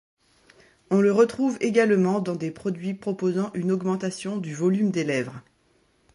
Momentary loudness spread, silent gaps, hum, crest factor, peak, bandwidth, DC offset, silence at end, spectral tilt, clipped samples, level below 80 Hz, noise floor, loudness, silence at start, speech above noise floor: 10 LU; none; none; 18 dB; -6 dBFS; 11.5 kHz; under 0.1%; 0.75 s; -6.5 dB/octave; under 0.1%; -68 dBFS; -64 dBFS; -24 LUFS; 0.9 s; 41 dB